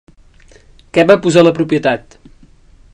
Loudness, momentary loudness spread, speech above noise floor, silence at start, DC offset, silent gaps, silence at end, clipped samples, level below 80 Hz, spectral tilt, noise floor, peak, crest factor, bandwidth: -12 LUFS; 9 LU; 33 dB; 0.95 s; under 0.1%; none; 0.95 s; 0.5%; -46 dBFS; -6 dB/octave; -44 dBFS; 0 dBFS; 14 dB; 10.5 kHz